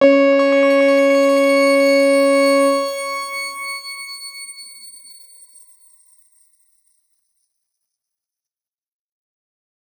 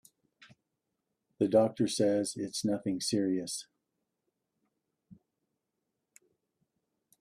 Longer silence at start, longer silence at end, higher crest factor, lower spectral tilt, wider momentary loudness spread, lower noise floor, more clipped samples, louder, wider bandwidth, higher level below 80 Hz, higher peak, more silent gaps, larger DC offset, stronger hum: second, 0 s vs 1.4 s; first, 5.1 s vs 2.05 s; about the same, 18 dB vs 22 dB; second, -2 dB/octave vs -5 dB/octave; first, 19 LU vs 8 LU; first, under -90 dBFS vs -85 dBFS; neither; first, -15 LUFS vs -31 LUFS; first, 19 kHz vs 14.5 kHz; second, -84 dBFS vs -74 dBFS; first, -2 dBFS vs -14 dBFS; neither; neither; neither